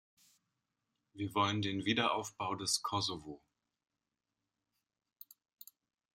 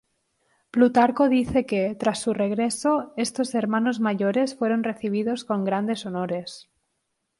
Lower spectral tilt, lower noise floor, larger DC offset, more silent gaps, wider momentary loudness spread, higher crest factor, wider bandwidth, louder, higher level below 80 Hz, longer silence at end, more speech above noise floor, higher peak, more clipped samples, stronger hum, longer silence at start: second, -3.5 dB/octave vs -5.5 dB/octave; first, -90 dBFS vs -77 dBFS; neither; neither; first, 24 LU vs 9 LU; about the same, 22 dB vs 18 dB; first, 16 kHz vs 11.5 kHz; second, -35 LUFS vs -24 LUFS; second, -76 dBFS vs -56 dBFS; first, 2.8 s vs 0.8 s; about the same, 54 dB vs 54 dB; second, -18 dBFS vs -6 dBFS; neither; neither; first, 1.15 s vs 0.75 s